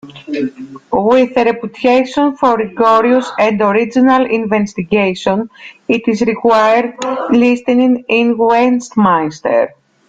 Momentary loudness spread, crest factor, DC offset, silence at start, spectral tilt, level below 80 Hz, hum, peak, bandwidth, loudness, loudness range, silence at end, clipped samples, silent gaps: 9 LU; 12 dB; under 0.1%; 0.05 s; -6 dB/octave; -52 dBFS; none; 0 dBFS; 7.8 kHz; -13 LUFS; 2 LU; 0.4 s; under 0.1%; none